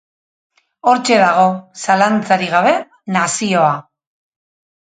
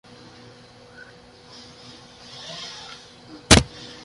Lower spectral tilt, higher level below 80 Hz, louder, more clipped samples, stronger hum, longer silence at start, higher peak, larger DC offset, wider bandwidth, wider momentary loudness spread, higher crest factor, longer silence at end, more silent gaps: about the same, -4 dB/octave vs -3 dB/octave; second, -66 dBFS vs -36 dBFS; first, -14 LUFS vs -18 LUFS; neither; neither; second, 0.85 s vs 2.5 s; about the same, 0 dBFS vs 0 dBFS; neither; second, 9.4 kHz vs 11.5 kHz; second, 8 LU vs 29 LU; second, 16 dB vs 26 dB; first, 1.05 s vs 0.4 s; neither